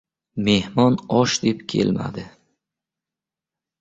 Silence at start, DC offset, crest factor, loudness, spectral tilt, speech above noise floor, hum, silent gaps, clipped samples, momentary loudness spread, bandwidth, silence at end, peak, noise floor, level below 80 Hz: 0.35 s; under 0.1%; 18 dB; -20 LUFS; -5 dB/octave; 68 dB; none; none; under 0.1%; 13 LU; 8 kHz; 1.5 s; -4 dBFS; -88 dBFS; -52 dBFS